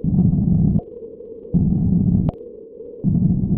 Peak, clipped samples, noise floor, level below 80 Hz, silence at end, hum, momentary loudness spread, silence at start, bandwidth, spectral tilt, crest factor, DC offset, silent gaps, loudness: -4 dBFS; under 0.1%; -37 dBFS; -32 dBFS; 0 s; none; 20 LU; 0 s; 1.3 kHz; -15.5 dB/octave; 14 dB; under 0.1%; none; -19 LUFS